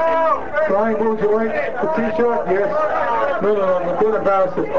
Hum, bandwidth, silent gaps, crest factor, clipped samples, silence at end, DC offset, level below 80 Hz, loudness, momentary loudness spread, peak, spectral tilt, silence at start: none; 7.4 kHz; none; 12 dB; under 0.1%; 0 s; 4%; -48 dBFS; -18 LUFS; 3 LU; -6 dBFS; -7.5 dB/octave; 0 s